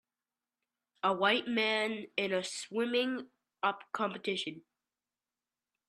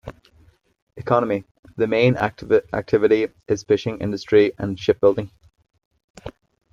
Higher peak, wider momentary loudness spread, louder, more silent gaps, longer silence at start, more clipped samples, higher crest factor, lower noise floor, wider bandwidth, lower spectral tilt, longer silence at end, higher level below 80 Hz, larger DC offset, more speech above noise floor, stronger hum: second, -14 dBFS vs -2 dBFS; second, 8 LU vs 22 LU; second, -33 LUFS vs -20 LUFS; second, none vs 0.82-0.87 s, 1.51-1.63 s, 5.85-5.91 s, 6.04-6.14 s; first, 1.05 s vs 0.05 s; neither; about the same, 22 dB vs 18 dB; first, under -90 dBFS vs -56 dBFS; first, 12.5 kHz vs 7.4 kHz; second, -3.5 dB/octave vs -7 dB/octave; first, 1.3 s vs 0.45 s; second, -84 dBFS vs -52 dBFS; neither; first, over 57 dB vs 36 dB; neither